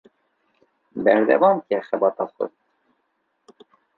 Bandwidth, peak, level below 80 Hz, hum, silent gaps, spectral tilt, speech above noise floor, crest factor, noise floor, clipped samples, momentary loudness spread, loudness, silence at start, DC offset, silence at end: 4.5 kHz; -2 dBFS; -72 dBFS; none; none; -8.5 dB/octave; 52 dB; 20 dB; -72 dBFS; under 0.1%; 14 LU; -20 LUFS; 0.95 s; under 0.1%; 1.5 s